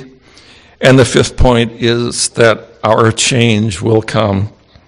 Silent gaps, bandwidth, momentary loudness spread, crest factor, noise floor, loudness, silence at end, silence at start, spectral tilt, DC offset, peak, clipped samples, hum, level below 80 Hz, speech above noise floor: none; 11 kHz; 6 LU; 12 dB; -41 dBFS; -11 LUFS; 0.4 s; 0 s; -4.5 dB/octave; under 0.1%; 0 dBFS; 0.8%; none; -26 dBFS; 31 dB